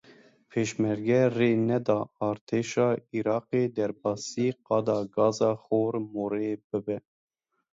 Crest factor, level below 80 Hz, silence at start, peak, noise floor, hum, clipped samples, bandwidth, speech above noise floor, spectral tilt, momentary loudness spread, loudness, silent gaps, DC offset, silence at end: 18 dB; -68 dBFS; 0.55 s; -10 dBFS; -57 dBFS; none; under 0.1%; 7.8 kHz; 30 dB; -6.5 dB/octave; 8 LU; -28 LUFS; 2.41-2.47 s, 6.64-6.70 s; under 0.1%; 0.75 s